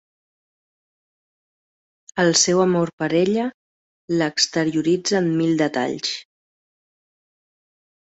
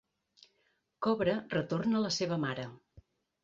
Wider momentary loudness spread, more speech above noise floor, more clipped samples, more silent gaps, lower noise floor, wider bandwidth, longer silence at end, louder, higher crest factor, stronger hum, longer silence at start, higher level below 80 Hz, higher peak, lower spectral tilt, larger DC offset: first, 10 LU vs 7 LU; first, over 70 dB vs 44 dB; neither; first, 2.93-2.98 s, 3.54-4.08 s vs none; first, under -90 dBFS vs -76 dBFS; about the same, 8.2 kHz vs 7.8 kHz; first, 1.8 s vs 0.45 s; first, -20 LUFS vs -33 LUFS; about the same, 20 dB vs 18 dB; neither; first, 2.15 s vs 1 s; about the same, -64 dBFS vs -68 dBFS; first, -2 dBFS vs -16 dBFS; second, -4 dB/octave vs -5.5 dB/octave; neither